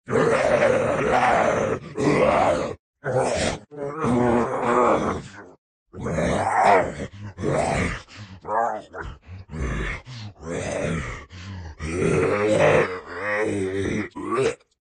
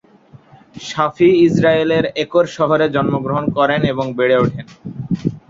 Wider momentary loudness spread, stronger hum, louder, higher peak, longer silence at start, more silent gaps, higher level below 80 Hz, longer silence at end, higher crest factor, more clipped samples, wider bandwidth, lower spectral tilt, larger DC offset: first, 17 LU vs 13 LU; neither; second, -23 LUFS vs -16 LUFS; about the same, -4 dBFS vs -2 dBFS; second, 0.05 s vs 0.75 s; first, 2.79-2.93 s, 5.58-5.86 s vs none; first, -42 dBFS vs -48 dBFS; first, 0.25 s vs 0.1 s; about the same, 18 dB vs 14 dB; neither; first, 10 kHz vs 7.6 kHz; second, -5.5 dB/octave vs -7 dB/octave; neither